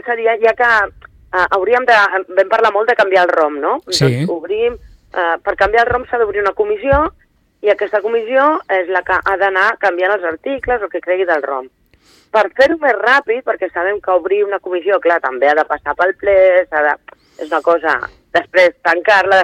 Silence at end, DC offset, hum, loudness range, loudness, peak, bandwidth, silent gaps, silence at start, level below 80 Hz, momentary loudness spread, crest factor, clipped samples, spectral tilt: 0 s; under 0.1%; none; 3 LU; -14 LUFS; 0 dBFS; 13.5 kHz; none; 0.05 s; -42 dBFS; 8 LU; 14 dB; under 0.1%; -5 dB/octave